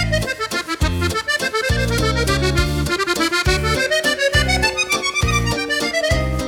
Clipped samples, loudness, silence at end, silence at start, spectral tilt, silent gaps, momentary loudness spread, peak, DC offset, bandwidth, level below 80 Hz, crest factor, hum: under 0.1%; -18 LUFS; 0 s; 0 s; -4 dB/octave; none; 4 LU; -2 dBFS; under 0.1%; 19 kHz; -26 dBFS; 16 dB; none